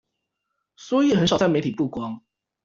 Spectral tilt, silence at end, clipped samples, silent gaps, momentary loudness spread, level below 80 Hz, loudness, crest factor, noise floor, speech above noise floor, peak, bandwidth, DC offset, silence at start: -6 dB/octave; 0.45 s; under 0.1%; none; 14 LU; -56 dBFS; -22 LUFS; 18 dB; -79 dBFS; 58 dB; -6 dBFS; 7.8 kHz; under 0.1%; 0.8 s